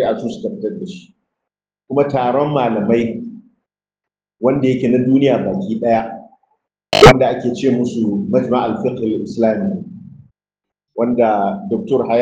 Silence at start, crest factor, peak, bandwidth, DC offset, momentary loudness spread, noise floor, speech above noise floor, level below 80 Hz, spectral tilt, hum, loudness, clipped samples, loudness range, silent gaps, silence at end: 0 s; 16 dB; 0 dBFS; 10 kHz; under 0.1%; 14 LU; -86 dBFS; 71 dB; -40 dBFS; -6.5 dB/octave; none; -16 LUFS; 0.4%; 6 LU; none; 0 s